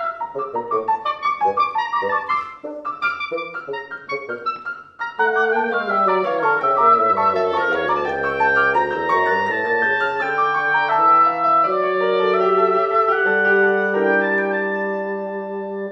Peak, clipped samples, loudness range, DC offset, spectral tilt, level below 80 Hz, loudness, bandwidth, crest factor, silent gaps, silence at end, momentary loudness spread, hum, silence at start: -4 dBFS; under 0.1%; 7 LU; under 0.1%; -6 dB/octave; -60 dBFS; -18 LUFS; 7.2 kHz; 16 dB; none; 0 s; 12 LU; none; 0 s